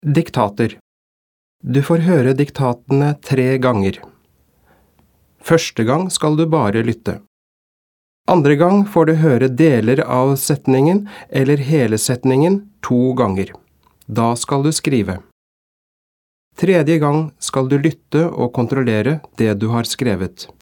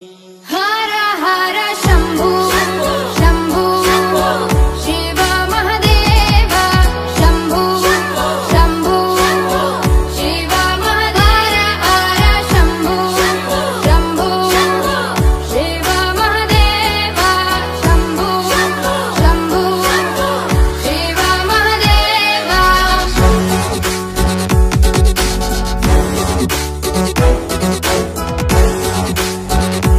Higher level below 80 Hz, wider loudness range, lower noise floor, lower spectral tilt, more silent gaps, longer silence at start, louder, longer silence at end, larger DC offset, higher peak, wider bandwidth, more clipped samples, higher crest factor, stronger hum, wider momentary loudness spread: second, -54 dBFS vs -18 dBFS; first, 5 LU vs 2 LU; first, -57 dBFS vs -36 dBFS; first, -6 dB/octave vs -4.5 dB/octave; first, 0.81-1.59 s, 7.27-8.24 s, 15.32-16.51 s vs none; about the same, 0.05 s vs 0 s; second, -16 LUFS vs -13 LUFS; first, 0.15 s vs 0 s; neither; about the same, 0 dBFS vs 0 dBFS; first, 18 kHz vs 15.5 kHz; neither; about the same, 16 dB vs 12 dB; neither; first, 9 LU vs 5 LU